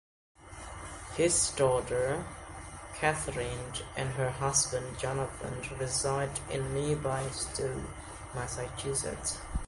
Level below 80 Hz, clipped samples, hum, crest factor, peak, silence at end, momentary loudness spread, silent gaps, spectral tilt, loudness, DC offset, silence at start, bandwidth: -48 dBFS; under 0.1%; none; 22 dB; -12 dBFS; 0 s; 16 LU; none; -3.5 dB/octave; -32 LUFS; under 0.1%; 0.4 s; 11.5 kHz